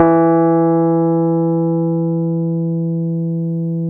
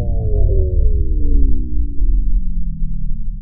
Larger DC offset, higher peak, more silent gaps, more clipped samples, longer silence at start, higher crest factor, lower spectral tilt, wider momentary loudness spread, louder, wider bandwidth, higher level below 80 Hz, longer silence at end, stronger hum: second, under 0.1% vs 4%; about the same, 0 dBFS vs 0 dBFS; neither; neither; about the same, 0 s vs 0 s; about the same, 14 dB vs 12 dB; second, -14 dB/octave vs -16 dB/octave; about the same, 7 LU vs 9 LU; first, -16 LUFS vs -21 LUFS; first, 2.5 kHz vs 0.8 kHz; second, -58 dBFS vs -14 dBFS; about the same, 0 s vs 0 s; neither